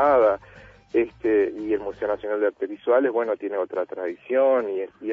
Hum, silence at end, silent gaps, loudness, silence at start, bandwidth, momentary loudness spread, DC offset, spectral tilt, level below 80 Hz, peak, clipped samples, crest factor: none; 0 s; none; -24 LUFS; 0 s; 5.2 kHz; 9 LU; under 0.1%; -7.5 dB/octave; -58 dBFS; -8 dBFS; under 0.1%; 14 dB